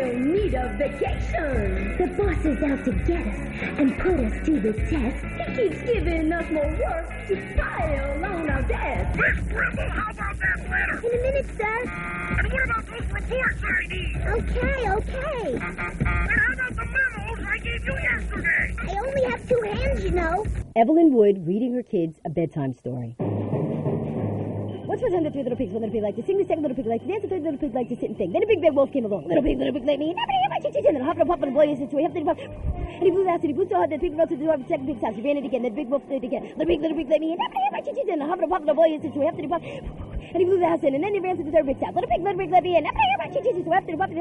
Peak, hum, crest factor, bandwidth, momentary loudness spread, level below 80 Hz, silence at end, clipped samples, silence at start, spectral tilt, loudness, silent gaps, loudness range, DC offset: -6 dBFS; none; 18 dB; 11.5 kHz; 8 LU; -34 dBFS; 0 s; under 0.1%; 0 s; -7.5 dB/octave; -24 LUFS; none; 4 LU; under 0.1%